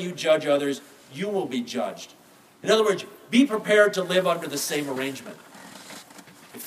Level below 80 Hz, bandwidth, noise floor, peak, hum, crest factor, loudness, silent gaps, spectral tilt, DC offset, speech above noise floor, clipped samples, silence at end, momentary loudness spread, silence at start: -80 dBFS; 15.5 kHz; -48 dBFS; -6 dBFS; none; 18 dB; -24 LUFS; none; -4 dB/octave; under 0.1%; 24 dB; under 0.1%; 0 s; 22 LU; 0 s